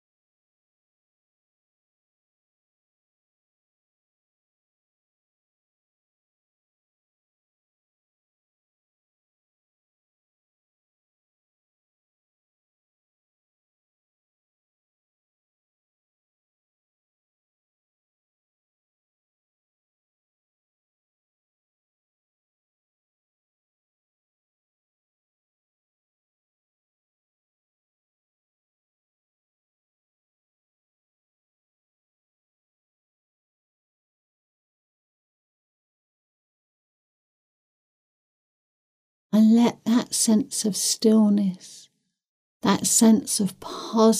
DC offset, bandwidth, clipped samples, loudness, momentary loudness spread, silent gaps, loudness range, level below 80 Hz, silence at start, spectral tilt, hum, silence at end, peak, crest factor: under 0.1%; 15.5 kHz; under 0.1%; -21 LUFS; 11 LU; 42.28-42.60 s; 4 LU; -76 dBFS; 39.35 s; -4.5 dB/octave; none; 0 s; -6 dBFS; 24 dB